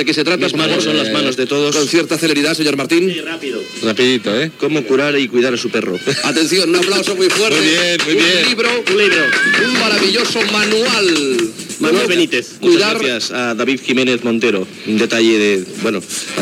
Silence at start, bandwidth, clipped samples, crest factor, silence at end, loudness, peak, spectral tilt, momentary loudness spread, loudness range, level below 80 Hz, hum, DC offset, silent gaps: 0 s; 16 kHz; under 0.1%; 14 dB; 0 s; -14 LUFS; 0 dBFS; -3 dB/octave; 7 LU; 4 LU; -68 dBFS; none; under 0.1%; none